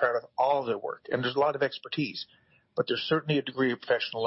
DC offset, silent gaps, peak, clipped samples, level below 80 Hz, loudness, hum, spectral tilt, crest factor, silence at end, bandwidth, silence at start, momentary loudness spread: under 0.1%; none; -14 dBFS; under 0.1%; -74 dBFS; -29 LUFS; none; -8.5 dB/octave; 16 dB; 0 s; 6 kHz; 0 s; 7 LU